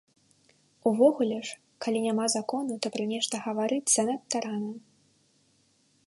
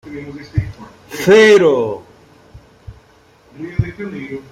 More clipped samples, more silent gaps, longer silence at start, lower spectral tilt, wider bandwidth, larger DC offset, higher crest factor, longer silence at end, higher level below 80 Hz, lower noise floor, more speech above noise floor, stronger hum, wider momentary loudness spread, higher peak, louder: neither; neither; first, 0.85 s vs 0.05 s; second, -3 dB/octave vs -5.5 dB/octave; second, 11.5 kHz vs 15 kHz; neither; about the same, 20 dB vs 16 dB; first, 1.3 s vs 0.1 s; second, -80 dBFS vs -40 dBFS; first, -67 dBFS vs -49 dBFS; about the same, 40 dB vs 37 dB; neither; second, 13 LU vs 23 LU; second, -10 dBFS vs -2 dBFS; second, -28 LUFS vs -14 LUFS